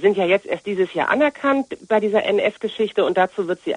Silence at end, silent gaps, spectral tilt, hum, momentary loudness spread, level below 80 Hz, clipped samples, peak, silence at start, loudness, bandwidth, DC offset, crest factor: 0 s; none; -6 dB/octave; none; 5 LU; -64 dBFS; under 0.1%; -4 dBFS; 0 s; -20 LUFS; 10 kHz; under 0.1%; 16 dB